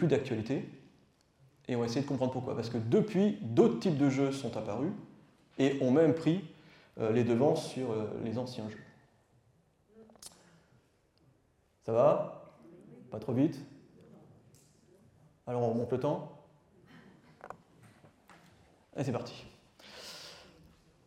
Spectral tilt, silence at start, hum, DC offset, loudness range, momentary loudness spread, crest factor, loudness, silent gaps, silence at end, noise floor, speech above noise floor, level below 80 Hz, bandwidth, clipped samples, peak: -7.5 dB/octave; 0 s; none; under 0.1%; 13 LU; 24 LU; 22 dB; -32 LUFS; none; 0.65 s; -71 dBFS; 40 dB; -72 dBFS; 13.5 kHz; under 0.1%; -12 dBFS